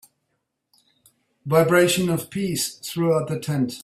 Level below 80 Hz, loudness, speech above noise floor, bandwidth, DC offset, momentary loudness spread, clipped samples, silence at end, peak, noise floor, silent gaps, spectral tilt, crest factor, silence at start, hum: -60 dBFS; -21 LUFS; 55 dB; 16 kHz; under 0.1%; 9 LU; under 0.1%; 0 s; -4 dBFS; -76 dBFS; none; -5 dB/octave; 20 dB; 1.45 s; none